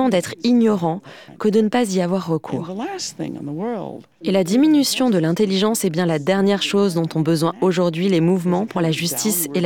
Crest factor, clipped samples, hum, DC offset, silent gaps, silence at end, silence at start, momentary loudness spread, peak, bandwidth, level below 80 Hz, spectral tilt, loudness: 14 dB; under 0.1%; none; under 0.1%; none; 0 s; 0 s; 11 LU; -6 dBFS; 19 kHz; -64 dBFS; -5 dB/octave; -19 LUFS